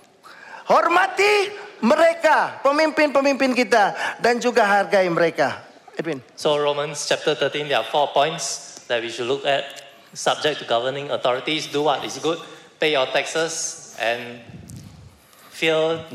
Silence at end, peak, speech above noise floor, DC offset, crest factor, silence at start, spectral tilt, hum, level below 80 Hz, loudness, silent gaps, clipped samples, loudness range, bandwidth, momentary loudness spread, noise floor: 0 s; -6 dBFS; 28 dB; under 0.1%; 14 dB; 0.25 s; -3 dB/octave; none; -66 dBFS; -20 LUFS; none; under 0.1%; 6 LU; 16 kHz; 14 LU; -48 dBFS